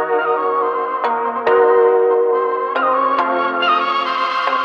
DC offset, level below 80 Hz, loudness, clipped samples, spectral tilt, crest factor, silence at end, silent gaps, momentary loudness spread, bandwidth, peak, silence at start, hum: under 0.1%; -66 dBFS; -16 LUFS; under 0.1%; -4.5 dB/octave; 14 dB; 0 s; none; 6 LU; 6.6 kHz; -2 dBFS; 0 s; none